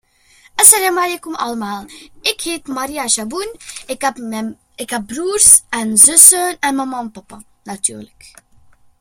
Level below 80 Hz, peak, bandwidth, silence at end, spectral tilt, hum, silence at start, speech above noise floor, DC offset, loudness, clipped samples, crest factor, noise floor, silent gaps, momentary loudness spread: -52 dBFS; 0 dBFS; over 20 kHz; 0.95 s; -0.5 dB/octave; none; 0.55 s; 35 dB; under 0.1%; -11 LUFS; 0.6%; 16 dB; -50 dBFS; none; 20 LU